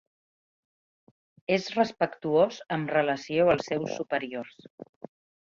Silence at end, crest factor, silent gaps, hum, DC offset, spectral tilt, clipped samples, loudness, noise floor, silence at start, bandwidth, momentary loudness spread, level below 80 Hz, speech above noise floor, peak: 0.65 s; 20 dB; 4.70-4.78 s; none; under 0.1%; -5.5 dB/octave; under 0.1%; -27 LUFS; under -90 dBFS; 1.5 s; 7.6 kHz; 16 LU; -66 dBFS; over 63 dB; -10 dBFS